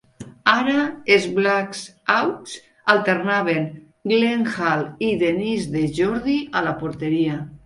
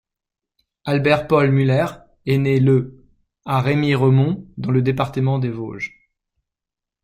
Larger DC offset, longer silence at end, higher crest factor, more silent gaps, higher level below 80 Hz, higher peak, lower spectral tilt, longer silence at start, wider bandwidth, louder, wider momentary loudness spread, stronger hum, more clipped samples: neither; second, 0.1 s vs 1.15 s; about the same, 20 dB vs 16 dB; neither; about the same, -54 dBFS vs -52 dBFS; about the same, 0 dBFS vs -2 dBFS; second, -5.5 dB/octave vs -8.5 dB/octave; second, 0.2 s vs 0.85 s; first, 11.5 kHz vs 8.6 kHz; about the same, -20 LUFS vs -19 LUFS; second, 8 LU vs 14 LU; neither; neither